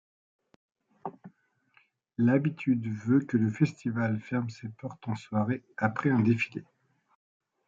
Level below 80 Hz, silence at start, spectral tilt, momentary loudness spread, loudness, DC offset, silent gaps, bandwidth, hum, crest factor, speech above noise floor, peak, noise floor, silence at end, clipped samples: -72 dBFS; 1.05 s; -8.5 dB/octave; 17 LU; -29 LUFS; under 0.1%; none; 7.6 kHz; none; 20 dB; 39 dB; -12 dBFS; -67 dBFS; 1.05 s; under 0.1%